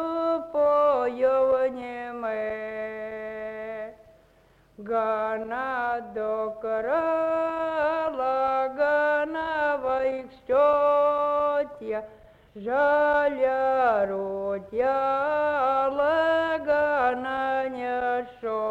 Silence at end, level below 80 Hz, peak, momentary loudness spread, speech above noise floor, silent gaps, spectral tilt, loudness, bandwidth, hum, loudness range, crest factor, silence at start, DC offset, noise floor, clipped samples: 0 s; -60 dBFS; -12 dBFS; 12 LU; 34 dB; none; -6 dB/octave; -25 LUFS; 7.6 kHz; none; 7 LU; 14 dB; 0 s; under 0.1%; -59 dBFS; under 0.1%